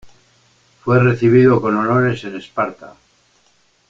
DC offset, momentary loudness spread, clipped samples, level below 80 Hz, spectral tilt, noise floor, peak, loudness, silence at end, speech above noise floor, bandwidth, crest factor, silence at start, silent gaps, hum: under 0.1%; 14 LU; under 0.1%; -50 dBFS; -9 dB/octave; -58 dBFS; -2 dBFS; -15 LUFS; 1 s; 43 dB; 7.4 kHz; 16 dB; 0.05 s; none; none